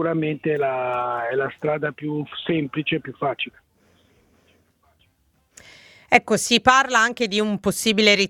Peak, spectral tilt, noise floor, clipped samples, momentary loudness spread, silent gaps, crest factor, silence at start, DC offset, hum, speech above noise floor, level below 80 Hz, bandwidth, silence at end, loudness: 0 dBFS; -3.5 dB/octave; -64 dBFS; under 0.1%; 11 LU; none; 22 dB; 0 s; under 0.1%; none; 43 dB; -58 dBFS; 18 kHz; 0 s; -21 LUFS